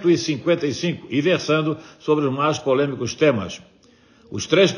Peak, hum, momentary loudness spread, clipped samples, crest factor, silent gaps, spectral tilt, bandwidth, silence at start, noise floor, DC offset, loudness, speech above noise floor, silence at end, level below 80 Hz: -4 dBFS; none; 10 LU; under 0.1%; 18 dB; none; -5 dB/octave; 11 kHz; 0 s; -53 dBFS; under 0.1%; -21 LUFS; 33 dB; 0 s; -62 dBFS